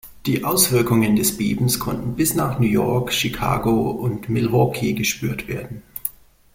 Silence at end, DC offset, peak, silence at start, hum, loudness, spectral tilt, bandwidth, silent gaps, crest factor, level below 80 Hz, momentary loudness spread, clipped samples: 0.45 s; under 0.1%; -2 dBFS; 0.05 s; none; -20 LUFS; -4.5 dB/octave; 16.5 kHz; none; 18 dB; -44 dBFS; 12 LU; under 0.1%